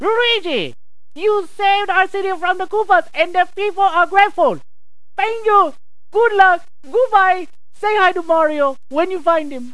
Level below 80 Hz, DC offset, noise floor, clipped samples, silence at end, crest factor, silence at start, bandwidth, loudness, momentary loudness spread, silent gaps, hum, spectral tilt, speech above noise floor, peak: -62 dBFS; 4%; -43 dBFS; under 0.1%; 0.05 s; 16 dB; 0 s; 11 kHz; -16 LUFS; 9 LU; none; none; -3.5 dB/octave; 27 dB; 0 dBFS